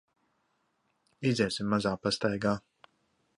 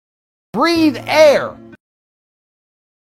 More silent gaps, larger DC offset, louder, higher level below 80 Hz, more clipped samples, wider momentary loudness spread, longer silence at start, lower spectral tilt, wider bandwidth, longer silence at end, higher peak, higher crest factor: neither; neither; second, -30 LUFS vs -13 LUFS; second, -62 dBFS vs -54 dBFS; neither; second, 4 LU vs 15 LU; first, 1.2 s vs 0.55 s; about the same, -5.5 dB/octave vs -4.5 dB/octave; second, 11.5 kHz vs 15 kHz; second, 0.8 s vs 1.6 s; second, -14 dBFS vs 0 dBFS; about the same, 20 dB vs 18 dB